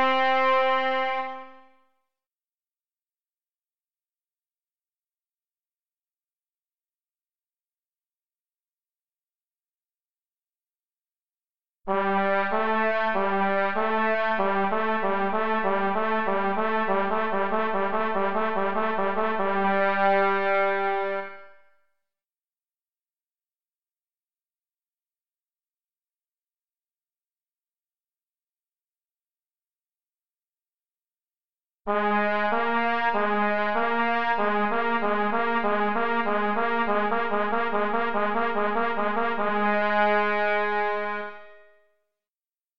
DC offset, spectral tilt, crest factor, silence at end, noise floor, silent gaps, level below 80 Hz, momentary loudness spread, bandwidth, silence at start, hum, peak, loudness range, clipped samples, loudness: under 0.1%; -7 dB/octave; 18 dB; 0 s; under -90 dBFS; none; -64 dBFS; 4 LU; 6.4 kHz; 0 s; none; -8 dBFS; 7 LU; under 0.1%; -24 LUFS